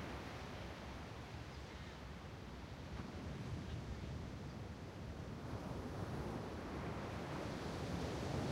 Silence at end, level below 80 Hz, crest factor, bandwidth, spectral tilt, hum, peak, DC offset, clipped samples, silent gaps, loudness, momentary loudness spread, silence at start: 0 s; -56 dBFS; 18 dB; 16 kHz; -6 dB/octave; none; -30 dBFS; under 0.1%; under 0.1%; none; -48 LUFS; 8 LU; 0 s